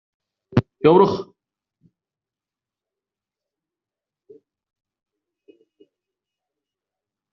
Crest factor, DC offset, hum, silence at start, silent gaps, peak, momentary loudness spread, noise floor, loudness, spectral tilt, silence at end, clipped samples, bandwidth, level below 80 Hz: 24 dB; under 0.1%; none; 0.55 s; none; -2 dBFS; 16 LU; -90 dBFS; -18 LUFS; -7 dB/octave; 6.1 s; under 0.1%; 6.4 kHz; -60 dBFS